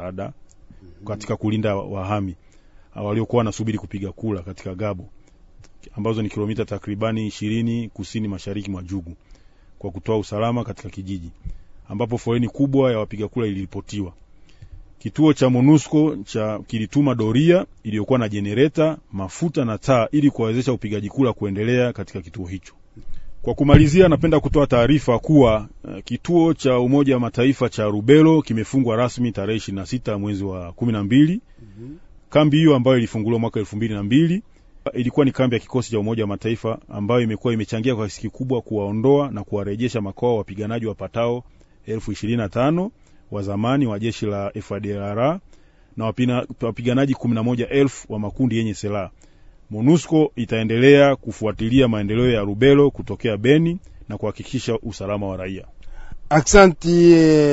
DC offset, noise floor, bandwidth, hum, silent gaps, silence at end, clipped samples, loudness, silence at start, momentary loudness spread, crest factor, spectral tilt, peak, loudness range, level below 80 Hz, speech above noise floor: under 0.1%; -47 dBFS; 8 kHz; none; none; 0 s; under 0.1%; -20 LUFS; 0 s; 16 LU; 20 dB; -6.5 dB/octave; 0 dBFS; 9 LU; -40 dBFS; 27 dB